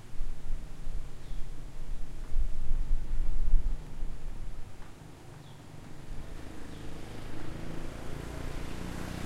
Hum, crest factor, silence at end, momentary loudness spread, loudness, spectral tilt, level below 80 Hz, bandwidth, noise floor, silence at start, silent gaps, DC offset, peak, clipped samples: none; 18 dB; 0 s; 12 LU; -42 LUFS; -6 dB/octave; -32 dBFS; 7.8 kHz; -47 dBFS; 0.05 s; none; under 0.1%; -10 dBFS; under 0.1%